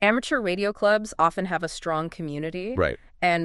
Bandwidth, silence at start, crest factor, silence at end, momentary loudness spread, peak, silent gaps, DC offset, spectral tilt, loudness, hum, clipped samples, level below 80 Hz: 11.5 kHz; 0 s; 20 dB; 0 s; 9 LU; -4 dBFS; none; under 0.1%; -5 dB/octave; -25 LUFS; none; under 0.1%; -48 dBFS